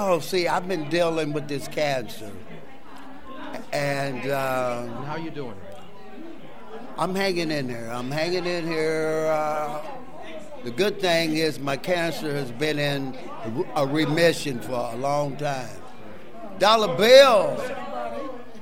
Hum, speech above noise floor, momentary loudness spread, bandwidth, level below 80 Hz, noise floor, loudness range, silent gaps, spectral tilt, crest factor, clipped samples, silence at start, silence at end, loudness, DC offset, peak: none; 21 dB; 22 LU; 16 kHz; -60 dBFS; -44 dBFS; 10 LU; none; -4.5 dB/octave; 24 dB; under 0.1%; 0 s; 0 s; -24 LUFS; 2%; -2 dBFS